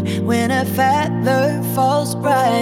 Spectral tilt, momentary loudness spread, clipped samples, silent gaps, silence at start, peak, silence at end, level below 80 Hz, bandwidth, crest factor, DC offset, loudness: -5.5 dB/octave; 2 LU; under 0.1%; none; 0 s; -4 dBFS; 0 s; -64 dBFS; 17.5 kHz; 12 dB; under 0.1%; -17 LUFS